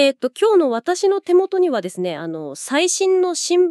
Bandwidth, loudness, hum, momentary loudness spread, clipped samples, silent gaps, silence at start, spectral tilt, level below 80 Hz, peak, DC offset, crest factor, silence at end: 12.5 kHz; -18 LUFS; none; 9 LU; under 0.1%; none; 0 s; -3 dB/octave; -82 dBFS; -4 dBFS; under 0.1%; 14 dB; 0 s